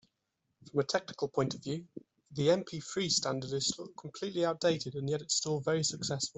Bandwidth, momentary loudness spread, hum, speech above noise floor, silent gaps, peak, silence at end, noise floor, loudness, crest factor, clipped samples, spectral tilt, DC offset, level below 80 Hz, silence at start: 8.2 kHz; 11 LU; none; 49 dB; none; -14 dBFS; 0.1 s; -83 dBFS; -33 LUFS; 20 dB; under 0.1%; -4 dB/octave; under 0.1%; -70 dBFS; 0.65 s